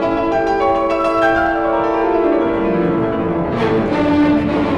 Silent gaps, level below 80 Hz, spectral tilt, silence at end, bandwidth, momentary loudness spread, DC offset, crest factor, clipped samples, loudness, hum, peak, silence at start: none; -36 dBFS; -7.5 dB/octave; 0 s; 9.2 kHz; 3 LU; under 0.1%; 12 dB; under 0.1%; -16 LUFS; none; -4 dBFS; 0 s